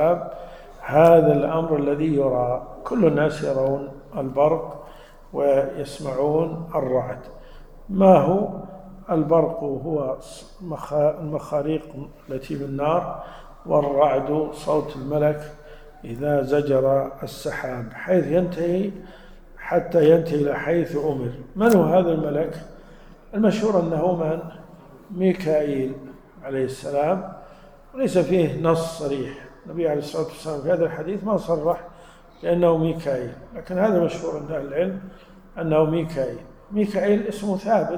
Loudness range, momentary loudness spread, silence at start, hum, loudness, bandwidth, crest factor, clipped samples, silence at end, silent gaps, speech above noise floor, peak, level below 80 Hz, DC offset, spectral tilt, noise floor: 5 LU; 17 LU; 0 s; none; -22 LUFS; over 20 kHz; 20 dB; under 0.1%; 0 s; none; 25 dB; -2 dBFS; -46 dBFS; under 0.1%; -7.5 dB/octave; -47 dBFS